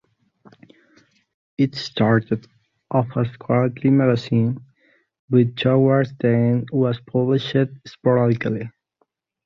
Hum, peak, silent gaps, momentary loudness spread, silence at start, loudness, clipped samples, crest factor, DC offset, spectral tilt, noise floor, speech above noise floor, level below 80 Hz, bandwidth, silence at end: none; -4 dBFS; 5.19-5.28 s; 9 LU; 1.6 s; -20 LUFS; under 0.1%; 18 dB; under 0.1%; -8.5 dB/octave; -69 dBFS; 50 dB; -58 dBFS; 7.2 kHz; 0.75 s